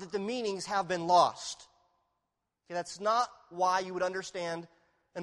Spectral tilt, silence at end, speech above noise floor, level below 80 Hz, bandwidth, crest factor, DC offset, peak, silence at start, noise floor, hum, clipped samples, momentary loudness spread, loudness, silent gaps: -3.5 dB/octave; 0 s; 53 dB; -74 dBFS; 12 kHz; 22 dB; under 0.1%; -12 dBFS; 0 s; -85 dBFS; none; under 0.1%; 15 LU; -32 LUFS; none